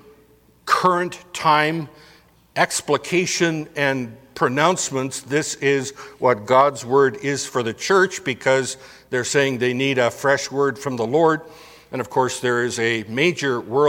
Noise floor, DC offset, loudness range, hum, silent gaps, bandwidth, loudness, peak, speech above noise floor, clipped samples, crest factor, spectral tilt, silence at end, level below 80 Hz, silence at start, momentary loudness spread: -54 dBFS; under 0.1%; 2 LU; none; none; 16.5 kHz; -20 LUFS; 0 dBFS; 34 dB; under 0.1%; 20 dB; -4 dB/octave; 0 s; -62 dBFS; 0.65 s; 9 LU